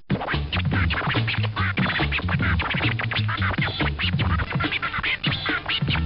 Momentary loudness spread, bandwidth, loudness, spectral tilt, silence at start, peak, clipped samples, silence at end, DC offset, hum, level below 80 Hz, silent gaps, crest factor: 2 LU; 5.6 kHz; -23 LUFS; -9.5 dB/octave; 0 s; -10 dBFS; under 0.1%; 0 s; under 0.1%; none; -34 dBFS; none; 14 dB